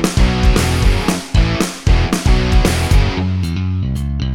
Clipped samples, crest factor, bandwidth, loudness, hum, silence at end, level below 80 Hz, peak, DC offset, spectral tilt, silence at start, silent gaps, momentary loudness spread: under 0.1%; 12 dB; 16 kHz; -16 LUFS; none; 0 s; -16 dBFS; 0 dBFS; under 0.1%; -5.5 dB/octave; 0 s; none; 5 LU